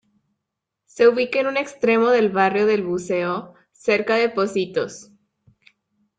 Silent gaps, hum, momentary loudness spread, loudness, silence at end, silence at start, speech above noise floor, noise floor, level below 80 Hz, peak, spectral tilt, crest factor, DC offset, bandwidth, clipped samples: none; none; 10 LU; -20 LUFS; 1.15 s; 0.95 s; 62 dB; -82 dBFS; -66 dBFS; -4 dBFS; -5 dB/octave; 18 dB; under 0.1%; 9.2 kHz; under 0.1%